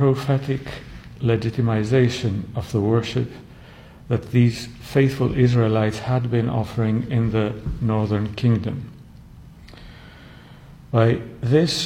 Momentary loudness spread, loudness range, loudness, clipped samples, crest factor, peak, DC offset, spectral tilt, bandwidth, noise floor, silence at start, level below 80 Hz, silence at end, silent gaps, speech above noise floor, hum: 11 LU; 5 LU; -21 LUFS; under 0.1%; 18 dB; -4 dBFS; under 0.1%; -7 dB/octave; 11 kHz; -43 dBFS; 0 s; -44 dBFS; 0 s; none; 23 dB; none